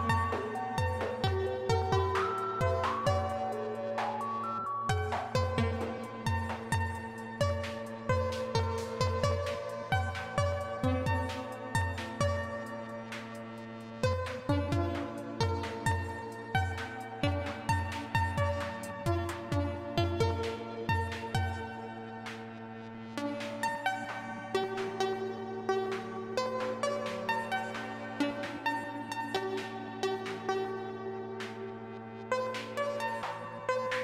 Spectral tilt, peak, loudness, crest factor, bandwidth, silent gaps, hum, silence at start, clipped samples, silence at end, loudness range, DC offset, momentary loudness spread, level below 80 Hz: -6 dB/octave; -16 dBFS; -34 LUFS; 18 dB; 14.5 kHz; none; none; 0 s; under 0.1%; 0 s; 5 LU; under 0.1%; 9 LU; -52 dBFS